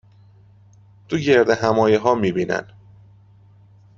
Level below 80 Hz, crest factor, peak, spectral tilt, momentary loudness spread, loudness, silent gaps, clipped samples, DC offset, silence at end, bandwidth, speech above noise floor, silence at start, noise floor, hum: -56 dBFS; 18 dB; -2 dBFS; -6 dB/octave; 9 LU; -18 LUFS; none; under 0.1%; under 0.1%; 1.35 s; 7.6 kHz; 32 dB; 1.1 s; -50 dBFS; none